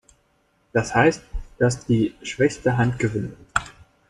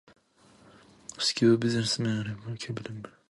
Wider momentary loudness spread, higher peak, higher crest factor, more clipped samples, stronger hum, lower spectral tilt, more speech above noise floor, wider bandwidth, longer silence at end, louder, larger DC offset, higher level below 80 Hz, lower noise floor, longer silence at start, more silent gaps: second, 10 LU vs 20 LU; first, -2 dBFS vs -10 dBFS; about the same, 20 dB vs 20 dB; neither; neither; about the same, -6 dB/octave vs -5 dB/octave; first, 44 dB vs 32 dB; about the same, 11 kHz vs 11.5 kHz; first, 0.4 s vs 0.2 s; first, -22 LUFS vs -28 LUFS; neither; first, -42 dBFS vs -64 dBFS; first, -65 dBFS vs -60 dBFS; second, 0.75 s vs 1.1 s; neither